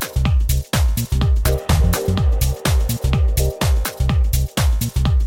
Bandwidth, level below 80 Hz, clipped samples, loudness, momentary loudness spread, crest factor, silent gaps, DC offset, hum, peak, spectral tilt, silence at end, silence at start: 17 kHz; -18 dBFS; under 0.1%; -19 LUFS; 2 LU; 12 dB; none; under 0.1%; none; -6 dBFS; -5 dB/octave; 0 s; 0 s